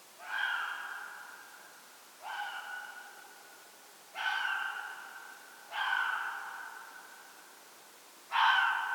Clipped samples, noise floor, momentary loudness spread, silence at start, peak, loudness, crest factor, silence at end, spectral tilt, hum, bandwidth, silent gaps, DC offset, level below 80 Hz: under 0.1%; -56 dBFS; 23 LU; 0 s; -16 dBFS; -34 LUFS; 22 dB; 0 s; 2 dB/octave; none; 19 kHz; none; under 0.1%; under -90 dBFS